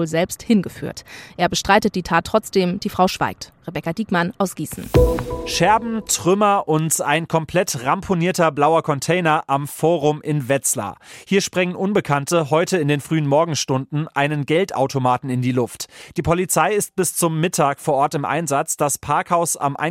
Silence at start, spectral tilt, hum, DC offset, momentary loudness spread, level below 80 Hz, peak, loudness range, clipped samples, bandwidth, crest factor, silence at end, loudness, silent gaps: 0 s; -4.5 dB/octave; none; under 0.1%; 7 LU; -38 dBFS; -2 dBFS; 2 LU; under 0.1%; 16.5 kHz; 18 dB; 0 s; -19 LUFS; none